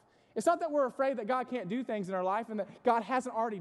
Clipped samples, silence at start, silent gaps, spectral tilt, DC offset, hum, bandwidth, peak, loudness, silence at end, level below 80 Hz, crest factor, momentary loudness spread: under 0.1%; 0.35 s; none; -5.5 dB/octave; under 0.1%; none; 12.5 kHz; -14 dBFS; -33 LUFS; 0 s; -82 dBFS; 18 dB; 6 LU